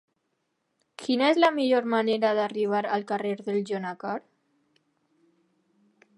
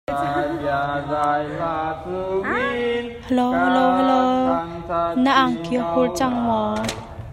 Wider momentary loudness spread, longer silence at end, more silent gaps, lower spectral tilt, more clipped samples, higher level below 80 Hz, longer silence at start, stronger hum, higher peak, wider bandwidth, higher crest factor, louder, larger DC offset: first, 12 LU vs 9 LU; first, 2 s vs 0 s; neither; about the same, -5.5 dB/octave vs -5.5 dB/octave; neither; second, -82 dBFS vs -46 dBFS; first, 1 s vs 0.1 s; neither; about the same, -6 dBFS vs -4 dBFS; second, 11.5 kHz vs 13 kHz; first, 22 dB vs 16 dB; second, -26 LUFS vs -21 LUFS; neither